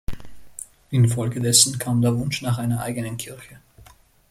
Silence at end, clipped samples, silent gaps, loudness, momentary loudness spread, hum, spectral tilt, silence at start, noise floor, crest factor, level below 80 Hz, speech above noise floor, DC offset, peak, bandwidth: 0.5 s; under 0.1%; none; -20 LUFS; 23 LU; none; -4 dB/octave; 0.1 s; -51 dBFS; 22 dB; -44 dBFS; 30 dB; under 0.1%; 0 dBFS; 15.5 kHz